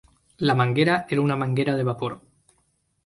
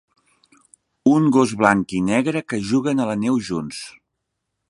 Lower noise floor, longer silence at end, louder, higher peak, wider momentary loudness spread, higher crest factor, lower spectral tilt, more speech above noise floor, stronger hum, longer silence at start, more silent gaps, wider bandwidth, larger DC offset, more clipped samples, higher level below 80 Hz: second, -69 dBFS vs -78 dBFS; about the same, 0.9 s vs 0.8 s; second, -23 LUFS vs -19 LUFS; second, -6 dBFS vs 0 dBFS; about the same, 11 LU vs 11 LU; about the same, 18 dB vs 20 dB; first, -7.5 dB/octave vs -6 dB/octave; second, 46 dB vs 59 dB; neither; second, 0.4 s vs 1.05 s; neither; about the same, 11.5 kHz vs 11.5 kHz; neither; neither; about the same, -60 dBFS vs -56 dBFS